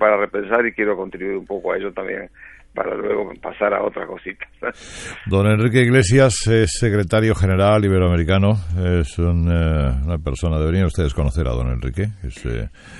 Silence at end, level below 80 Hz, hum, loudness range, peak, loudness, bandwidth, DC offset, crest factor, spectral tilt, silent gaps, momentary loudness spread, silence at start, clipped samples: 0 s; -30 dBFS; none; 8 LU; -2 dBFS; -19 LUFS; 11.5 kHz; under 0.1%; 18 dB; -6 dB/octave; none; 14 LU; 0 s; under 0.1%